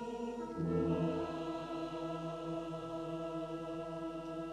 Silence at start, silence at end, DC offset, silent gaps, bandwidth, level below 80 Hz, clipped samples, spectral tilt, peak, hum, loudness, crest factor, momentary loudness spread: 0 s; 0 s; under 0.1%; none; 11 kHz; -62 dBFS; under 0.1%; -7.5 dB/octave; -24 dBFS; none; -40 LUFS; 16 dB; 8 LU